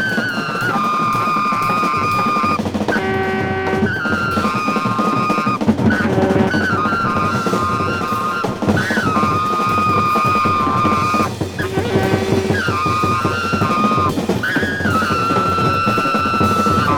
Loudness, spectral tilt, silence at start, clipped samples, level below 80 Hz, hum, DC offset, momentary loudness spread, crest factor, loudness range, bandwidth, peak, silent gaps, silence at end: -16 LUFS; -5.5 dB/octave; 0 s; under 0.1%; -44 dBFS; none; under 0.1%; 4 LU; 16 dB; 1 LU; 19.5 kHz; 0 dBFS; none; 0 s